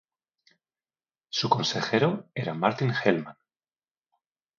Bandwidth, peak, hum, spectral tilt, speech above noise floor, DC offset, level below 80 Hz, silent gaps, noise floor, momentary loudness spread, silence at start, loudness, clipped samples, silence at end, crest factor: 7.4 kHz; -6 dBFS; none; -5 dB/octave; over 64 dB; under 0.1%; -72 dBFS; none; under -90 dBFS; 8 LU; 1.35 s; -26 LUFS; under 0.1%; 1.25 s; 24 dB